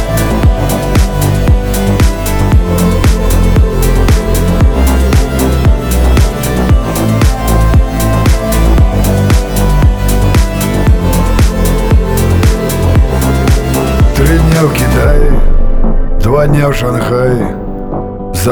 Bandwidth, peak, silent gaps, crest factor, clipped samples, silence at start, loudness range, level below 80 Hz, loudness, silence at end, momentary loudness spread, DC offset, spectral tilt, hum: over 20 kHz; 0 dBFS; none; 8 dB; under 0.1%; 0 s; 1 LU; -10 dBFS; -11 LUFS; 0 s; 4 LU; under 0.1%; -6 dB/octave; none